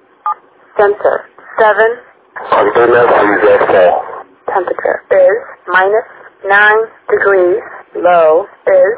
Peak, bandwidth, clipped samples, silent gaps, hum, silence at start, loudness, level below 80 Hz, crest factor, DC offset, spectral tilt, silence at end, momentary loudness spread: 0 dBFS; 4 kHz; 0.2%; none; none; 0.25 s; -10 LUFS; -52 dBFS; 10 dB; under 0.1%; -8 dB/octave; 0 s; 14 LU